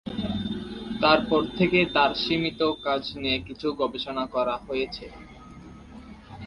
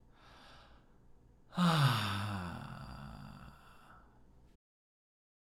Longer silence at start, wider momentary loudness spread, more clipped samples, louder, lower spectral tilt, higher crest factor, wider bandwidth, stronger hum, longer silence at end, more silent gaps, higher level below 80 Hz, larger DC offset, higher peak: second, 0.05 s vs 0.25 s; second, 24 LU vs 27 LU; neither; first, -25 LUFS vs -35 LUFS; about the same, -6.5 dB/octave vs -5.5 dB/octave; about the same, 22 dB vs 22 dB; second, 11 kHz vs 17 kHz; neither; second, 0 s vs 1.55 s; neither; first, -50 dBFS vs -62 dBFS; neither; first, -4 dBFS vs -18 dBFS